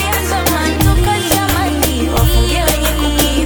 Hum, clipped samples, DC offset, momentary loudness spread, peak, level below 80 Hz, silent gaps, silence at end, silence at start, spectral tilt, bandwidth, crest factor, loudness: none; under 0.1%; under 0.1%; 2 LU; 0 dBFS; -18 dBFS; none; 0 s; 0 s; -4 dB/octave; 19.5 kHz; 14 dB; -14 LUFS